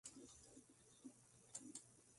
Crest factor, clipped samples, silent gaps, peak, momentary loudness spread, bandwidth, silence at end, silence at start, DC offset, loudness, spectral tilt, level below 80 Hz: 24 dB; under 0.1%; none; -40 dBFS; 12 LU; 11.5 kHz; 0 s; 0.05 s; under 0.1%; -60 LUFS; -2.5 dB/octave; -84 dBFS